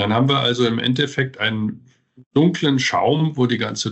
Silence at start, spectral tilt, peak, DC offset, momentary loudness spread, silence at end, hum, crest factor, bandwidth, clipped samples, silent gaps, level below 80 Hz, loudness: 0 s; -5.5 dB/octave; -2 dBFS; under 0.1%; 5 LU; 0 s; none; 16 dB; 8.4 kHz; under 0.1%; 2.26-2.31 s; -58 dBFS; -19 LUFS